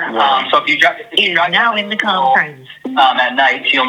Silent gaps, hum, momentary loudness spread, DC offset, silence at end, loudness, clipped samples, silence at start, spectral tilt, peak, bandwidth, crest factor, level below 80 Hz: none; none; 4 LU; under 0.1%; 0 s; -13 LUFS; under 0.1%; 0 s; -3 dB/octave; 0 dBFS; 16.5 kHz; 14 dB; -66 dBFS